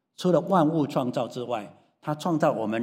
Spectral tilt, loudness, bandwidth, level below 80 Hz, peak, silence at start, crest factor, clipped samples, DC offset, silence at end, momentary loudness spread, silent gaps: -7 dB/octave; -26 LUFS; 15.5 kHz; -76 dBFS; -8 dBFS; 0.2 s; 18 dB; under 0.1%; under 0.1%; 0 s; 12 LU; none